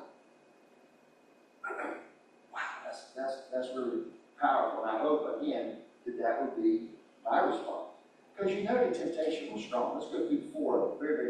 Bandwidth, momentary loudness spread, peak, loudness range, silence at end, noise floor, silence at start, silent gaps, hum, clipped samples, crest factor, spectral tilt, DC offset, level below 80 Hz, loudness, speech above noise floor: 10.5 kHz; 14 LU; -16 dBFS; 8 LU; 0 s; -63 dBFS; 0 s; none; none; under 0.1%; 18 dB; -5.5 dB/octave; under 0.1%; -80 dBFS; -34 LUFS; 31 dB